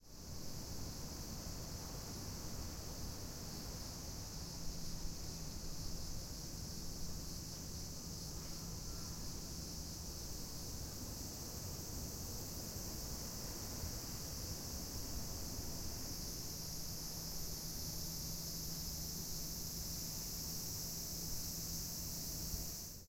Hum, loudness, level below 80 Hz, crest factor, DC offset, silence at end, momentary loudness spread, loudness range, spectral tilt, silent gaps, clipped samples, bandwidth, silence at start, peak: none; -45 LUFS; -52 dBFS; 18 dB; under 0.1%; 0 s; 5 LU; 4 LU; -3 dB/octave; none; under 0.1%; 16.5 kHz; 0 s; -28 dBFS